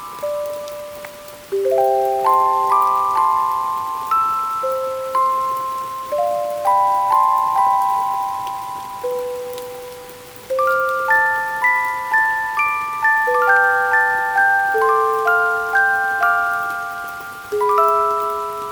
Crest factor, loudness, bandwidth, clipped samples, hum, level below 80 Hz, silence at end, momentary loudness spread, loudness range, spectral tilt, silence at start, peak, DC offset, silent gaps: 16 dB; -17 LUFS; over 20 kHz; under 0.1%; none; -58 dBFS; 0 s; 13 LU; 5 LU; -2.5 dB/octave; 0 s; -2 dBFS; under 0.1%; none